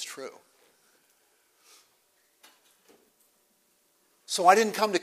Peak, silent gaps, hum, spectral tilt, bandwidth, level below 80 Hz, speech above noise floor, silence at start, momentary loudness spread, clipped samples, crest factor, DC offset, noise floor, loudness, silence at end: -4 dBFS; none; none; -2.5 dB/octave; 15.5 kHz; -88 dBFS; 45 dB; 0 s; 22 LU; under 0.1%; 26 dB; under 0.1%; -69 dBFS; -23 LUFS; 0 s